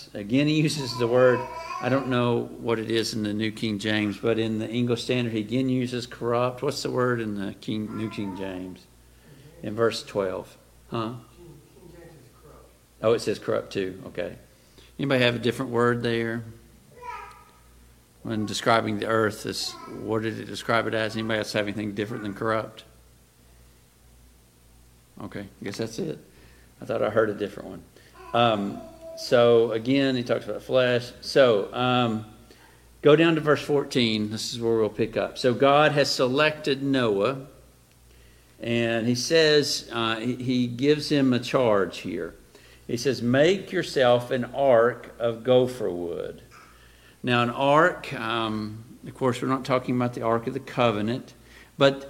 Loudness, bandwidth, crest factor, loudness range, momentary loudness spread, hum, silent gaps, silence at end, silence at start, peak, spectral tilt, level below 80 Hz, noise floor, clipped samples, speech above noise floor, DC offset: -25 LUFS; 16.5 kHz; 22 dB; 9 LU; 15 LU; 60 Hz at -55 dBFS; none; 0 s; 0 s; -4 dBFS; -5.5 dB/octave; -58 dBFS; -55 dBFS; under 0.1%; 31 dB; under 0.1%